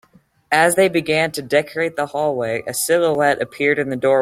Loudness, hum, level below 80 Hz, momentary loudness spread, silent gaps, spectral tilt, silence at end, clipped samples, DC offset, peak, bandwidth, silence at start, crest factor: -18 LUFS; none; -58 dBFS; 7 LU; none; -3.5 dB/octave; 0 s; under 0.1%; under 0.1%; -2 dBFS; 16.5 kHz; 0.5 s; 16 dB